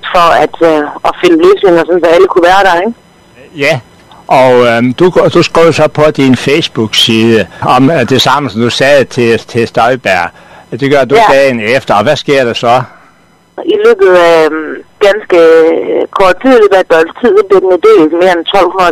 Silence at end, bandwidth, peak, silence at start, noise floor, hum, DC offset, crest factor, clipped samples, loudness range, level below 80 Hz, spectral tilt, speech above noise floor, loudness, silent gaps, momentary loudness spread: 0 s; 14 kHz; 0 dBFS; 0.05 s; -44 dBFS; none; under 0.1%; 6 dB; 3%; 2 LU; -40 dBFS; -5 dB/octave; 38 dB; -7 LUFS; none; 7 LU